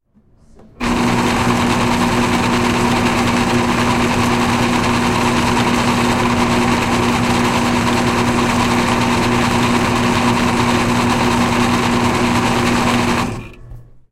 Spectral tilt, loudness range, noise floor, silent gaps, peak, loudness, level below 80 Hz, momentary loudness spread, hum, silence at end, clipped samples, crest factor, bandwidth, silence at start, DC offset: -4.5 dB/octave; 1 LU; -50 dBFS; none; 0 dBFS; -15 LUFS; -32 dBFS; 1 LU; none; 0.3 s; under 0.1%; 14 dB; 16 kHz; 0.6 s; under 0.1%